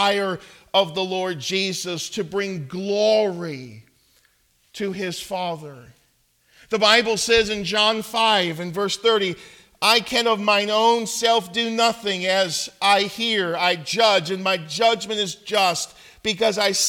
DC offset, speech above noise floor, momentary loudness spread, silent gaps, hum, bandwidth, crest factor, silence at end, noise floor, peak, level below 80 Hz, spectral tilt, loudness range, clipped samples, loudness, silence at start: under 0.1%; 42 dB; 10 LU; none; none; 18 kHz; 20 dB; 0 s; -63 dBFS; -2 dBFS; -56 dBFS; -2.5 dB/octave; 6 LU; under 0.1%; -20 LUFS; 0 s